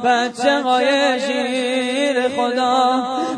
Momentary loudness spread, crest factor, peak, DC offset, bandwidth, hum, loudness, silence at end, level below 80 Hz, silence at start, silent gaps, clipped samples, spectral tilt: 4 LU; 14 dB; -2 dBFS; under 0.1%; 10 kHz; none; -18 LUFS; 0 s; -68 dBFS; 0 s; none; under 0.1%; -2.5 dB/octave